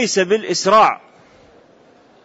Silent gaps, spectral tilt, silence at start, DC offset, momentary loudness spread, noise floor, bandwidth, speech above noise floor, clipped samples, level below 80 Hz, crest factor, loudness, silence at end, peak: none; -3 dB/octave; 0 s; under 0.1%; 6 LU; -50 dBFS; 8 kHz; 35 dB; under 0.1%; -62 dBFS; 16 dB; -15 LUFS; 1.25 s; -4 dBFS